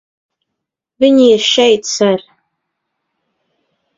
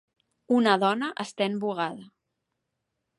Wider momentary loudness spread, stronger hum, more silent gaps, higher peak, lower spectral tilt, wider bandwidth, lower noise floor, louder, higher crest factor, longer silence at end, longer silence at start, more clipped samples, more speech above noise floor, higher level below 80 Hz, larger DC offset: second, 6 LU vs 11 LU; neither; neither; first, 0 dBFS vs -8 dBFS; second, -3.5 dB/octave vs -5 dB/octave; second, 7.8 kHz vs 11.5 kHz; about the same, -78 dBFS vs -81 dBFS; first, -11 LUFS vs -26 LUFS; about the same, 16 dB vs 20 dB; first, 1.8 s vs 1.1 s; first, 1 s vs 0.5 s; neither; first, 68 dB vs 56 dB; first, -60 dBFS vs -78 dBFS; neither